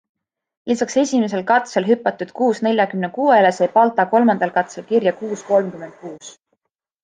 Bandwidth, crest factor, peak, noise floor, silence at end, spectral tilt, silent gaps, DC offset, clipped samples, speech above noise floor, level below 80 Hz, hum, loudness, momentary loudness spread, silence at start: 9.6 kHz; 16 dB; -2 dBFS; -73 dBFS; 0.7 s; -5 dB/octave; none; under 0.1%; under 0.1%; 55 dB; -68 dBFS; none; -18 LUFS; 15 LU; 0.65 s